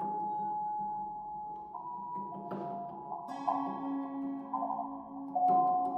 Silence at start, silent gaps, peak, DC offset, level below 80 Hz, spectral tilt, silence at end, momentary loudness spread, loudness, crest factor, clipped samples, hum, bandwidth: 0 s; none; -18 dBFS; under 0.1%; -74 dBFS; -8.5 dB/octave; 0 s; 13 LU; -36 LUFS; 18 dB; under 0.1%; none; 6 kHz